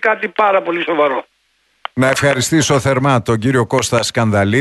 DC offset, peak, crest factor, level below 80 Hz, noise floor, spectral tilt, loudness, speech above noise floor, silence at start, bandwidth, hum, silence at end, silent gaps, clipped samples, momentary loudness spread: under 0.1%; -2 dBFS; 14 dB; -48 dBFS; -61 dBFS; -4.5 dB/octave; -15 LUFS; 47 dB; 0 s; 12.5 kHz; none; 0 s; none; under 0.1%; 4 LU